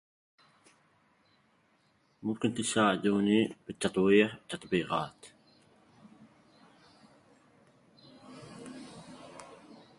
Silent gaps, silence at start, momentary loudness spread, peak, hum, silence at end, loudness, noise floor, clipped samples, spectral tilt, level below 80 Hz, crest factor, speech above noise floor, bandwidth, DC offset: none; 2.25 s; 24 LU; -10 dBFS; none; 0.25 s; -30 LUFS; -70 dBFS; under 0.1%; -5 dB/octave; -68 dBFS; 24 dB; 41 dB; 11.5 kHz; under 0.1%